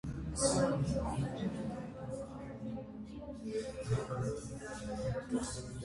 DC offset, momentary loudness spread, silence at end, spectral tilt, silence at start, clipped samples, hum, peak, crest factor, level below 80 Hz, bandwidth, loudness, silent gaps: under 0.1%; 12 LU; 0 s; -5.5 dB/octave; 0.05 s; under 0.1%; none; -18 dBFS; 20 dB; -52 dBFS; 11.5 kHz; -38 LUFS; none